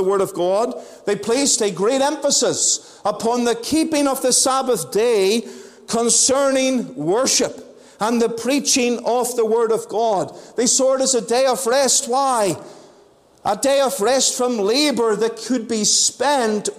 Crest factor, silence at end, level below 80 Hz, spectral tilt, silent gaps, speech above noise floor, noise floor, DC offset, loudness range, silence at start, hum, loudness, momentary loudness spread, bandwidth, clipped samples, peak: 14 dB; 0 s; -60 dBFS; -2 dB/octave; none; 33 dB; -51 dBFS; under 0.1%; 2 LU; 0 s; none; -18 LUFS; 8 LU; 16 kHz; under 0.1%; -4 dBFS